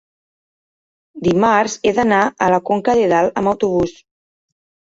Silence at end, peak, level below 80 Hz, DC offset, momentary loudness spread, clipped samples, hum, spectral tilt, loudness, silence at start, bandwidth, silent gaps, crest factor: 1.05 s; -2 dBFS; -48 dBFS; under 0.1%; 5 LU; under 0.1%; none; -5.5 dB/octave; -16 LUFS; 1.15 s; 8 kHz; none; 16 dB